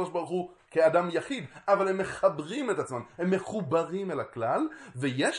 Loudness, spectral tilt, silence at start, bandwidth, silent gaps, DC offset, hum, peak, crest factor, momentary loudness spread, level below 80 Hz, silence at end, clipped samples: -29 LUFS; -5.5 dB/octave; 0 s; 11 kHz; none; under 0.1%; none; -10 dBFS; 18 dB; 9 LU; -68 dBFS; 0 s; under 0.1%